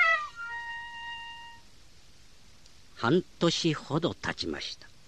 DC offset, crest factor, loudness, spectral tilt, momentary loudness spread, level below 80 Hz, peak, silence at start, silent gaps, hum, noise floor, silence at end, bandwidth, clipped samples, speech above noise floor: 0.2%; 22 dB; -31 LUFS; -4.5 dB/octave; 14 LU; -60 dBFS; -10 dBFS; 0 s; none; none; -58 dBFS; 0.2 s; 11.5 kHz; under 0.1%; 28 dB